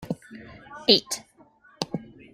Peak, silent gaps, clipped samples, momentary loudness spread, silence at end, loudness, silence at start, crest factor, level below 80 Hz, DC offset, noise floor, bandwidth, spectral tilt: -2 dBFS; none; under 0.1%; 24 LU; 0.3 s; -25 LUFS; 0 s; 26 dB; -62 dBFS; under 0.1%; -57 dBFS; 16.5 kHz; -3 dB/octave